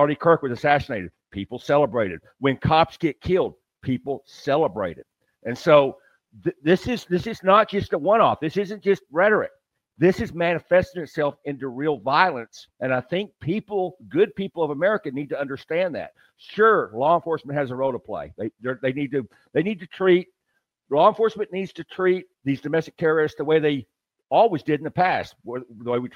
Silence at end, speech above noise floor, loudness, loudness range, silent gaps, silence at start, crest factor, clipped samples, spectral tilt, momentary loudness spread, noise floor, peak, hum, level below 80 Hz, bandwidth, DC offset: 0.05 s; 53 dB; -23 LUFS; 4 LU; none; 0 s; 22 dB; under 0.1%; -7 dB/octave; 13 LU; -75 dBFS; -2 dBFS; none; -54 dBFS; 12 kHz; under 0.1%